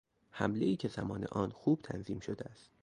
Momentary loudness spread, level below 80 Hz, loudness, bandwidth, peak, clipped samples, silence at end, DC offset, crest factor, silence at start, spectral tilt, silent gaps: 11 LU; -62 dBFS; -37 LUFS; 10.5 kHz; -16 dBFS; under 0.1%; 0.3 s; under 0.1%; 22 dB; 0.35 s; -7.5 dB/octave; none